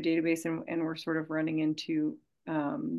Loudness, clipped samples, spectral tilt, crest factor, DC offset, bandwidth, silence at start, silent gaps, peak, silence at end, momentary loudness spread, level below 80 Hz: -32 LUFS; under 0.1%; -6 dB/octave; 16 dB; under 0.1%; 12.5 kHz; 0 s; none; -16 dBFS; 0 s; 6 LU; -80 dBFS